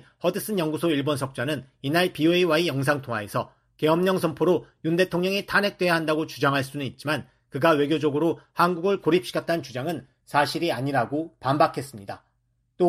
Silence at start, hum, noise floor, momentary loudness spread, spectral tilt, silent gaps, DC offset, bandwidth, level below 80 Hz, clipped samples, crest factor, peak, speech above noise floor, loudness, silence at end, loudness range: 0.25 s; none; -71 dBFS; 9 LU; -5.5 dB/octave; none; under 0.1%; 14.5 kHz; -62 dBFS; under 0.1%; 20 dB; -6 dBFS; 46 dB; -24 LUFS; 0 s; 2 LU